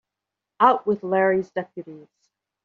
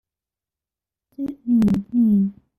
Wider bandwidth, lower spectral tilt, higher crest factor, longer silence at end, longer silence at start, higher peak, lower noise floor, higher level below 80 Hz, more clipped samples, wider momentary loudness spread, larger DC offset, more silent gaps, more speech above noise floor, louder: about the same, 7 kHz vs 6.6 kHz; second, -4.5 dB/octave vs -9.5 dB/octave; first, 22 dB vs 12 dB; first, 0.65 s vs 0.25 s; second, 0.6 s vs 1.2 s; first, -2 dBFS vs -10 dBFS; about the same, -86 dBFS vs -89 dBFS; second, -68 dBFS vs -52 dBFS; neither; first, 19 LU vs 13 LU; neither; neither; second, 64 dB vs 71 dB; about the same, -21 LUFS vs -19 LUFS